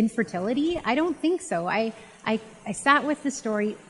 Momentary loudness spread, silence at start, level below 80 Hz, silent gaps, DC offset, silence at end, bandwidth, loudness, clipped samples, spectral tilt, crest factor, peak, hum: 9 LU; 0 s; -60 dBFS; none; under 0.1%; 0.1 s; 11.5 kHz; -26 LUFS; under 0.1%; -4.5 dB/octave; 22 dB; -4 dBFS; none